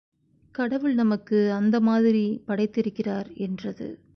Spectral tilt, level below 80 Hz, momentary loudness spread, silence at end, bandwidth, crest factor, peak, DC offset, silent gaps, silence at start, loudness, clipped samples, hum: -8.5 dB/octave; -64 dBFS; 12 LU; 0.2 s; 6.2 kHz; 12 dB; -12 dBFS; under 0.1%; none; 0.6 s; -25 LUFS; under 0.1%; none